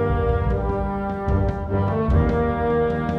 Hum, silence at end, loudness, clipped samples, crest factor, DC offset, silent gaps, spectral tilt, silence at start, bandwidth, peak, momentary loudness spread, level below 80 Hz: none; 0 s; -22 LUFS; under 0.1%; 14 dB; under 0.1%; none; -10 dB/octave; 0 s; 6 kHz; -8 dBFS; 5 LU; -28 dBFS